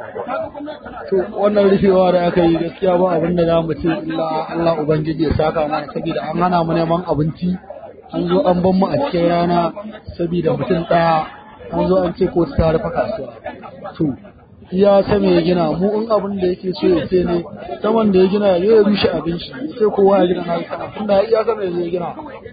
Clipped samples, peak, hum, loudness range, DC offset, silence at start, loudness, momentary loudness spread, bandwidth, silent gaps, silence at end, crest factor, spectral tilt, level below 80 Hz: under 0.1%; -2 dBFS; none; 3 LU; under 0.1%; 0 s; -17 LUFS; 14 LU; 5 kHz; none; 0 s; 14 dB; -12.5 dB/octave; -40 dBFS